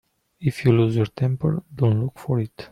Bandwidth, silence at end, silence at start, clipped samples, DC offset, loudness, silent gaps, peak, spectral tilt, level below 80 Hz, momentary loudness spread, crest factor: 11.5 kHz; 0.05 s; 0.4 s; under 0.1%; under 0.1%; -22 LUFS; none; -4 dBFS; -8.5 dB/octave; -54 dBFS; 7 LU; 18 dB